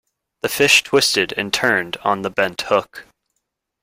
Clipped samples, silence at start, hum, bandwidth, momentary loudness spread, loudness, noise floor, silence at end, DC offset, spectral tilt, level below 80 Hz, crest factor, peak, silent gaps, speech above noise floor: under 0.1%; 0.45 s; none; 16.5 kHz; 10 LU; -17 LUFS; -76 dBFS; 0.8 s; under 0.1%; -2 dB/octave; -58 dBFS; 20 dB; 0 dBFS; none; 57 dB